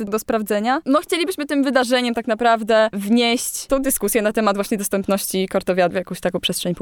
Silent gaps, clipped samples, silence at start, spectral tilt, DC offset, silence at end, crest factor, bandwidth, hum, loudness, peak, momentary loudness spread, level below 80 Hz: none; under 0.1%; 0 s; -3.5 dB/octave; under 0.1%; 0 s; 18 dB; over 20 kHz; none; -19 LUFS; -2 dBFS; 5 LU; -46 dBFS